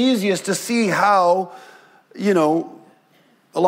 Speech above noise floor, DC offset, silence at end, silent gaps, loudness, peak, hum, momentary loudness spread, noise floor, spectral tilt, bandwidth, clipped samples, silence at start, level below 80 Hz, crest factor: 39 dB; under 0.1%; 0 s; none; -18 LUFS; -2 dBFS; none; 13 LU; -57 dBFS; -4.5 dB/octave; 16 kHz; under 0.1%; 0 s; -74 dBFS; 16 dB